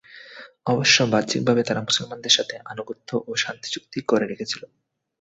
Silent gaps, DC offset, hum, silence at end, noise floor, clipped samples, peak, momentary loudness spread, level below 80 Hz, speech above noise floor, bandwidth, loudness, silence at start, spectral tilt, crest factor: none; under 0.1%; none; 0.55 s; -44 dBFS; under 0.1%; -4 dBFS; 17 LU; -62 dBFS; 21 dB; 8.2 kHz; -22 LUFS; 0.1 s; -3 dB/octave; 20 dB